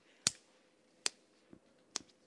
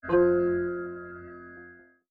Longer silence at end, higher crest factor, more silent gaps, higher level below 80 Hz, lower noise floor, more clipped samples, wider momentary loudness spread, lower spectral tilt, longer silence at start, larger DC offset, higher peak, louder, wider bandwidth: about the same, 0.3 s vs 0.35 s; first, 34 dB vs 16 dB; neither; second, -82 dBFS vs -56 dBFS; first, -70 dBFS vs -52 dBFS; neither; second, 9 LU vs 23 LU; second, 0 dB/octave vs -11 dB/octave; first, 0.25 s vs 0.05 s; neither; about the same, -12 dBFS vs -12 dBFS; second, -40 LUFS vs -26 LUFS; first, 11.5 kHz vs 3.2 kHz